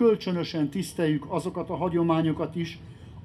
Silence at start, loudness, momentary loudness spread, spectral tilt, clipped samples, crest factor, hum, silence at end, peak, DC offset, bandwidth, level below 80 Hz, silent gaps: 0 s; -28 LUFS; 10 LU; -7 dB/octave; under 0.1%; 16 dB; none; 0 s; -12 dBFS; under 0.1%; 13 kHz; -56 dBFS; none